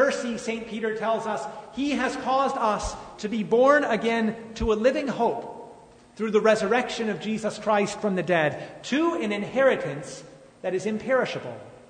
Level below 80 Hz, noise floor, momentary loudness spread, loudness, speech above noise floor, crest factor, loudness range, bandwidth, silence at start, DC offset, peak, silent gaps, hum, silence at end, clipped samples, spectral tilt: -48 dBFS; -49 dBFS; 14 LU; -25 LUFS; 24 dB; 20 dB; 3 LU; 9.6 kHz; 0 s; under 0.1%; -6 dBFS; none; none; 0.1 s; under 0.1%; -5 dB/octave